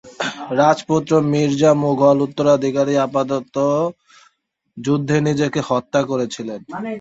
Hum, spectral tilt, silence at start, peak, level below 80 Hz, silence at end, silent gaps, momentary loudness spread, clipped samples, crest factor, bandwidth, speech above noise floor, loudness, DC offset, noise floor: none; -6.5 dB/octave; 0.05 s; -2 dBFS; -58 dBFS; 0 s; none; 11 LU; under 0.1%; 16 dB; 8 kHz; 44 dB; -18 LUFS; under 0.1%; -61 dBFS